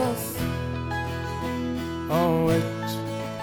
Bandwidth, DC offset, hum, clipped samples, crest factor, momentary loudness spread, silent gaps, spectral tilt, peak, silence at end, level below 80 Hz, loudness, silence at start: over 20 kHz; under 0.1%; none; under 0.1%; 14 dB; 8 LU; none; -6 dB/octave; -12 dBFS; 0 s; -46 dBFS; -27 LUFS; 0 s